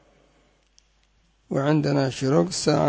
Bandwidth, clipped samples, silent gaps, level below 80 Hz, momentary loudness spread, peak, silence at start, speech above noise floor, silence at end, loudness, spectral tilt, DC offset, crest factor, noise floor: 8 kHz; under 0.1%; none; -56 dBFS; 4 LU; -6 dBFS; 1.5 s; 42 dB; 0 s; -23 LUFS; -6 dB/octave; under 0.1%; 18 dB; -63 dBFS